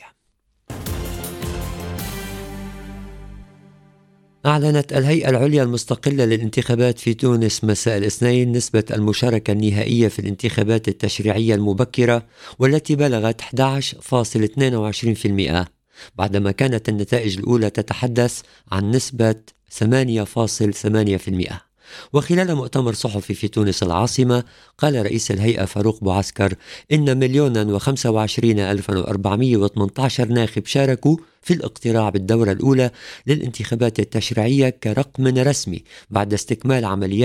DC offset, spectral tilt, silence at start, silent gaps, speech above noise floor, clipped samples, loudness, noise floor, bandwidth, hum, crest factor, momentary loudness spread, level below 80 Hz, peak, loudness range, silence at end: under 0.1%; -6 dB/octave; 0.05 s; none; 48 dB; under 0.1%; -19 LUFS; -67 dBFS; 16.5 kHz; none; 18 dB; 11 LU; -44 dBFS; 0 dBFS; 3 LU; 0 s